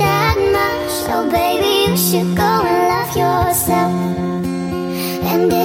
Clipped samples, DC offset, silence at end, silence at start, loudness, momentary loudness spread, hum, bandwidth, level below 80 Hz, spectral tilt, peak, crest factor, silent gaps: under 0.1%; under 0.1%; 0 s; 0 s; -16 LUFS; 7 LU; none; 17 kHz; -36 dBFS; -4.5 dB/octave; -2 dBFS; 12 dB; none